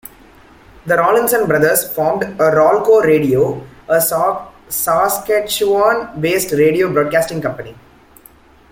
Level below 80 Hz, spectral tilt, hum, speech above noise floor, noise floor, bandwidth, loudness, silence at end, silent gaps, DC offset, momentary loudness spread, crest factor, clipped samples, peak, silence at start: -48 dBFS; -4.5 dB/octave; none; 31 dB; -45 dBFS; 17 kHz; -14 LUFS; 1 s; none; under 0.1%; 11 LU; 14 dB; under 0.1%; -2 dBFS; 0.85 s